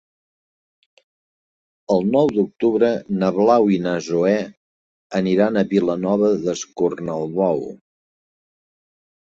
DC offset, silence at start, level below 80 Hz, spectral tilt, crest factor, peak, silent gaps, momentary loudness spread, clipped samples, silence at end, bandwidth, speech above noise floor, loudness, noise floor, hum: under 0.1%; 1.9 s; -60 dBFS; -6.5 dB/octave; 18 dB; -2 dBFS; 4.57-5.10 s; 8 LU; under 0.1%; 1.55 s; 7.8 kHz; over 72 dB; -19 LUFS; under -90 dBFS; none